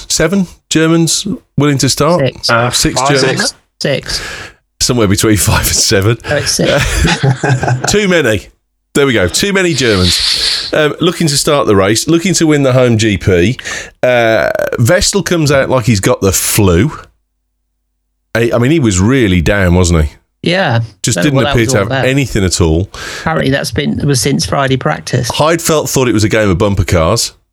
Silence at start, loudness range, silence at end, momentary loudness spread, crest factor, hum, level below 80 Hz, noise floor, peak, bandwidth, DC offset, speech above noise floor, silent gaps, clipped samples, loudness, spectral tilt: 0 s; 2 LU; 0.25 s; 6 LU; 12 dB; none; -28 dBFS; -65 dBFS; 0 dBFS; 18.5 kHz; under 0.1%; 55 dB; none; under 0.1%; -11 LUFS; -4.5 dB/octave